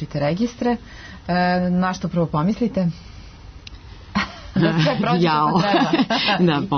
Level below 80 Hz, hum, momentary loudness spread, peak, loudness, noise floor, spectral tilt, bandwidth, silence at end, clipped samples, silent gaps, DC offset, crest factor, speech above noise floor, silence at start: -44 dBFS; none; 18 LU; -6 dBFS; -20 LUFS; -39 dBFS; -6.5 dB/octave; 6.4 kHz; 0 s; under 0.1%; none; under 0.1%; 14 dB; 20 dB; 0 s